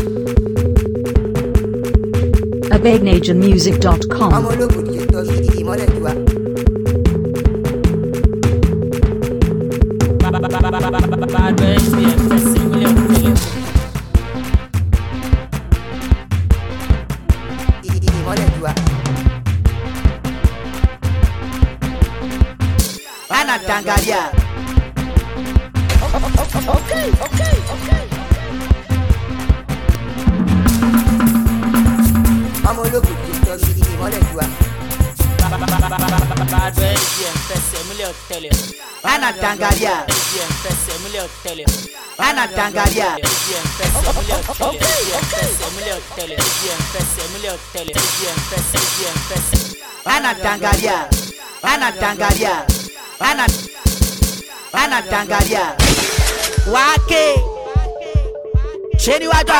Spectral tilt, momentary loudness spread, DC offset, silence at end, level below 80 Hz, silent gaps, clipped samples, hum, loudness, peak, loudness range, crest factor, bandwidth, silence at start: -5 dB/octave; 7 LU; 0.4%; 0 s; -20 dBFS; none; under 0.1%; none; -16 LUFS; -2 dBFS; 4 LU; 14 dB; 19 kHz; 0 s